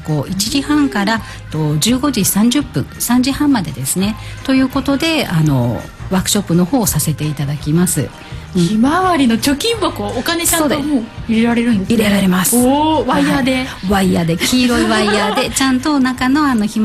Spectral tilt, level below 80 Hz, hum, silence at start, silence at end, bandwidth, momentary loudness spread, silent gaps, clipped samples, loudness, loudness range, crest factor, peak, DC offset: -4.5 dB/octave; -36 dBFS; none; 0 s; 0 s; 15 kHz; 7 LU; none; under 0.1%; -14 LUFS; 2 LU; 14 dB; 0 dBFS; under 0.1%